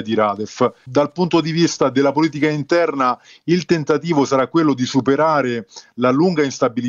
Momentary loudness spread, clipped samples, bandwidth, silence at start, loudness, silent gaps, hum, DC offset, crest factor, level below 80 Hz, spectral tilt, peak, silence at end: 4 LU; under 0.1%; 7.6 kHz; 0 s; -18 LUFS; none; none; under 0.1%; 14 dB; -60 dBFS; -6 dB/octave; -2 dBFS; 0 s